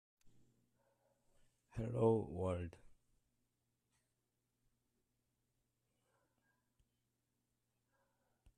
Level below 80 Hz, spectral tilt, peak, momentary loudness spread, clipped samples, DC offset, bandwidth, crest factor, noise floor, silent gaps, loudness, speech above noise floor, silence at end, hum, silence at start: -70 dBFS; -9 dB/octave; -22 dBFS; 16 LU; under 0.1%; under 0.1%; 10.5 kHz; 26 dB; -87 dBFS; none; -40 LUFS; 49 dB; 5.7 s; none; 0.25 s